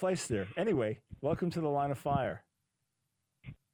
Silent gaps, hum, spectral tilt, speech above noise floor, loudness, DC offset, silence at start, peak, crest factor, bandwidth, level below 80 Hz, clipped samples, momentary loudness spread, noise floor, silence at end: none; none; -6 dB/octave; 50 dB; -34 LUFS; under 0.1%; 0 s; -18 dBFS; 18 dB; 19 kHz; -60 dBFS; under 0.1%; 11 LU; -84 dBFS; 0.2 s